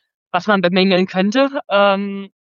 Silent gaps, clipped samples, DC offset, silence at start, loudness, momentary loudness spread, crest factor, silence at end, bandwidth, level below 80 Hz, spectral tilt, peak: none; under 0.1%; under 0.1%; 0.35 s; -16 LUFS; 8 LU; 16 dB; 0.15 s; 7.2 kHz; -74 dBFS; -6.5 dB/octave; -2 dBFS